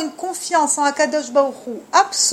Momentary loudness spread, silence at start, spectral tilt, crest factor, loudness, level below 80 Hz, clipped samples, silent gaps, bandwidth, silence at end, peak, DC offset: 9 LU; 0 s; 0 dB/octave; 18 dB; -18 LUFS; -70 dBFS; under 0.1%; none; 16 kHz; 0 s; 0 dBFS; under 0.1%